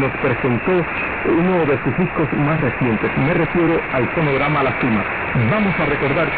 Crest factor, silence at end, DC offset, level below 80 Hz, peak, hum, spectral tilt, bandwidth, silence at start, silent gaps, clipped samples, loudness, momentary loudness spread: 12 dB; 0 s; under 0.1%; -38 dBFS; -6 dBFS; none; -6 dB/octave; 4.7 kHz; 0 s; none; under 0.1%; -18 LUFS; 3 LU